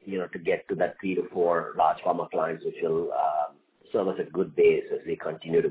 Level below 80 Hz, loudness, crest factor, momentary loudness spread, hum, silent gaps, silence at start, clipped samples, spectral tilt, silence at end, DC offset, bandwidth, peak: -66 dBFS; -27 LUFS; 18 dB; 9 LU; none; none; 0.05 s; under 0.1%; -10 dB/octave; 0 s; under 0.1%; 4 kHz; -10 dBFS